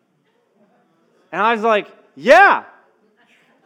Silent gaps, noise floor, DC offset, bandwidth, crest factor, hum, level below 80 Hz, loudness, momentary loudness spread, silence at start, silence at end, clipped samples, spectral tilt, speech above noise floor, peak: none; -63 dBFS; under 0.1%; 14 kHz; 18 dB; none; -60 dBFS; -14 LUFS; 13 LU; 1.3 s; 1.05 s; under 0.1%; -4 dB/octave; 49 dB; 0 dBFS